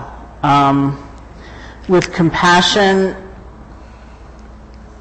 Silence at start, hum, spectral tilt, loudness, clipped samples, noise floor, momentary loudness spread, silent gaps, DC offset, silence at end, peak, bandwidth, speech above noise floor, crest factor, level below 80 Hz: 0 s; none; -5 dB/octave; -13 LUFS; under 0.1%; -36 dBFS; 24 LU; none; under 0.1%; 0.05 s; -2 dBFS; 8.8 kHz; 24 dB; 14 dB; -38 dBFS